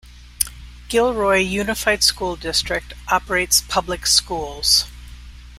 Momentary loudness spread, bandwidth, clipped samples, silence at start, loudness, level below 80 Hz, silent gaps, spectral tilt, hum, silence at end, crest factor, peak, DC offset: 9 LU; 16 kHz; under 0.1%; 0.05 s; -18 LUFS; -38 dBFS; none; -1.5 dB/octave; 60 Hz at -40 dBFS; 0 s; 20 dB; 0 dBFS; under 0.1%